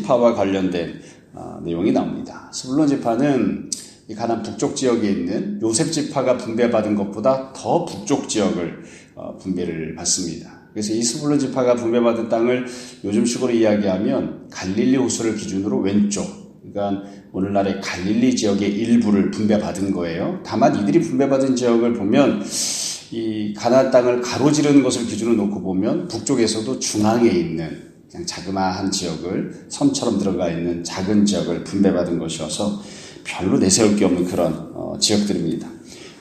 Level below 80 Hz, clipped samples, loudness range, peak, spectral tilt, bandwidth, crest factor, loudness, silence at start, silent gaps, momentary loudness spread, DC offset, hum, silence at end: -54 dBFS; under 0.1%; 4 LU; 0 dBFS; -5 dB/octave; 13.5 kHz; 20 dB; -20 LUFS; 0 s; none; 13 LU; under 0.1%; none; 0.05 s